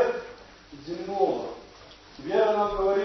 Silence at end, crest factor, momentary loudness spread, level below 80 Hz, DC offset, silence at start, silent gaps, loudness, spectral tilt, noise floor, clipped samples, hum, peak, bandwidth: 0 s; 18 dB; 24 LU; -52 dBFS; under 0.1%; 0 s; none; -27 LUFS; -5.5 dB/octave; -49 dBFS; under 0.1%; none; -10 dBFS; 6.2 kHz